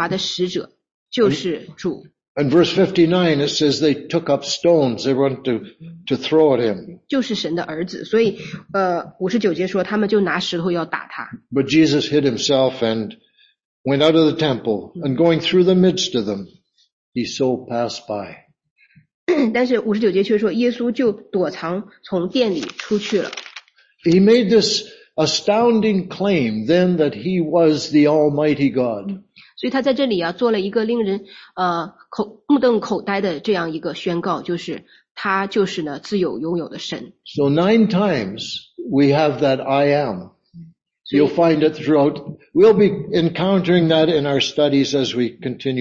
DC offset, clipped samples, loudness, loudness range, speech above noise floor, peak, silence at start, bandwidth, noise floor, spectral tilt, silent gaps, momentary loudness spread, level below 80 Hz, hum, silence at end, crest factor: under 0.1%; under 0.1%; -18 LUFS; 5 LU; 25 dB; -2 dBFS; 0 s; 7.8 kHz; -43 dBFS; -5.5 dB/octave; 0.94-1.06 s, 2.28-2.35 s, 13.65-13.84 s, 16.93-17.12 s, 18.70-18.76 s, 19.14-19.27 s, 35.11-35.15 s; 12 LU; -58 dBFS; none; 0 s; 16 dB